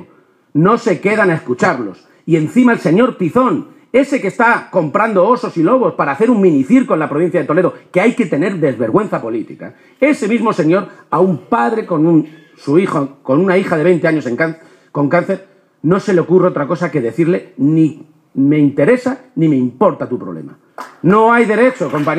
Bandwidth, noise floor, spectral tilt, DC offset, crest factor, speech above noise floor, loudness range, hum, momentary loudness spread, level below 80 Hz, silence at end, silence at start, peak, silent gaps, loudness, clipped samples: 10.5 kHz; -49 dBFS; -7.5 dB/octave; under 0.1%; 14 dB; 36 dB; 3 LU; none; 10 LU; -60 dBFS; 0 s; 0 s; 0 dBFS; none; -14 LUFS; under 0.1%